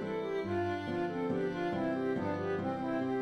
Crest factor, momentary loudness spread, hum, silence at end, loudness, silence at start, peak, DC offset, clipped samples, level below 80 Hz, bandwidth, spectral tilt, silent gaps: 12 dB; 2 LU; none; 0 s; -35 LUFS; 0 s; -22 dBFS; under 0.1%; under 0.1%; -66 dBFS; 9.8 kHz; -8 dB/octave; none